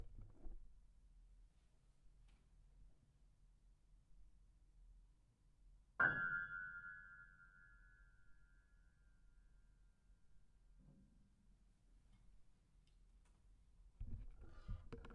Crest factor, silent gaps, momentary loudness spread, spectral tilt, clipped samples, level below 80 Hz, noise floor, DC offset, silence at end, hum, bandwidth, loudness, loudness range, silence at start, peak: 30 dB; none; 26 LU; -3.5 dB/octave; under 0.1%; -62 dBFS; -74 dBFS; under 0.1%; 0 s; none; 7.2 kHz; -44 LUFS; 19 LU; 0 s; -24 dBFS